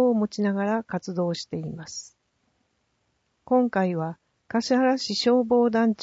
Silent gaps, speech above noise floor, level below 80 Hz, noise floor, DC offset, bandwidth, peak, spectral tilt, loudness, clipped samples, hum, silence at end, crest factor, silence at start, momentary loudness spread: none; 49 dB; -66 dBFS; -72 dBFS; under 0.1%; 8 kHz; -10 dBFS; -5.5 dB/octave; -24 LUFS; under 0.1%; none; 0 s; 16 dB; 0 s; 13 LU